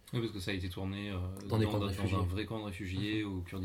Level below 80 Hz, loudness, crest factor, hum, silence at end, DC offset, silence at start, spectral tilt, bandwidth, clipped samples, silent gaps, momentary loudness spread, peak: -60 dBFS; -36 LUFS; 16 dB; none; 0 s; under 0.1%; 0.05 s; -6.5 dB/octave; 16 kHz; under 0.1%; none; 7 LU; -20 dBFS